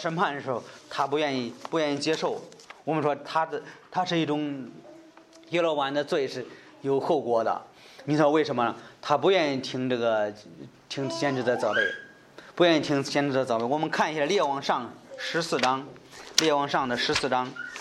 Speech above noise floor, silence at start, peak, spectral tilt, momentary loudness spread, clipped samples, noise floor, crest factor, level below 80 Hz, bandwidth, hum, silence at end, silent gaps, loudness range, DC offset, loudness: 25 dB; 0 s; -4 dBFS; -4 dB/octave; 15 LU; under 0.1%; -52 dBFS; 24 dB; -68 dBFS; 16 kHz; none; 0 s; none; 4 LU; under 0.1%; -27 LUFS